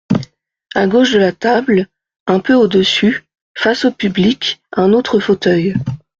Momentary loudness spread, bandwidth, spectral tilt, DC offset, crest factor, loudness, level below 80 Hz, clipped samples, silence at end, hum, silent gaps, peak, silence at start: 10 LU; 7.6 kHz; -6 dB/octave; under 0.1%; 12 dB; -14 LUFS; -50 dBFS; under 0.1%; 0.25 s; none; 2.20-2.26 s, 3.41-3.55 s; -2 dBFS; 0.1 s